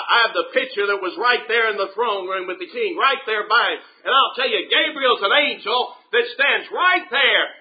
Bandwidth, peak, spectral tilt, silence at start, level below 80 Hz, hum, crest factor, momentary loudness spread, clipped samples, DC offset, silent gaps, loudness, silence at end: 5 kHz; -2 dBFS; -6 dB/octave; 0 s; -78 dBFS; none; 18 dB; 7 LU; under 0.1%; under 0.1%; none; -18 LUFS; 0.05 s